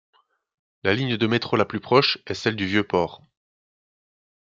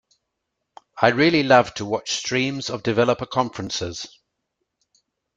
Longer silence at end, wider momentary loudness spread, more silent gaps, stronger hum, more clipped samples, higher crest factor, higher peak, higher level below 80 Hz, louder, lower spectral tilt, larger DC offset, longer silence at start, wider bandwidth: about the same, 1.35 s vs 1.3 s; second, 7 LU vs 11 LU; neither; neither; neither; about the same, 22 dB vs 20 dB; about the same, -4 dBFS vs -2 dBFS; second, -64 dBFS vs -58 dBFS; about the same, -23 LUFS vs -21 LUFS; first, -6 dB/octave vs -4.5 dB/octave; neither; about the same, 0.85 s vs 0.95 s; second, 7.6 kHz vs 9.4 kHz